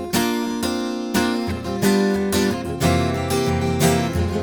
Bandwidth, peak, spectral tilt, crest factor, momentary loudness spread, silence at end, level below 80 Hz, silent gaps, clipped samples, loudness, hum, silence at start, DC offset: over 20 kHz; -2 dBFS; -5 dB/octave; 18 dB; 5 LU; 0 s; -44 dBFS; none; under 0.1%; -21 LUFS; none; 0 s; under 0.1%